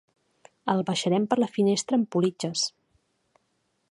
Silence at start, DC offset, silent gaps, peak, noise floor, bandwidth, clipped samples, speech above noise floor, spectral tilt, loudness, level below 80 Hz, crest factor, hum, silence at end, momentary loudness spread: 0.65 s; under 0.1%; none; -6 dBFS; -74 dBFS; 11.5 kHz; under 0.1%; 49 dB; -5 dB/octave; -26 LUFS; -74 dBFS; 20 dB; none; 1.25 s; 5 LU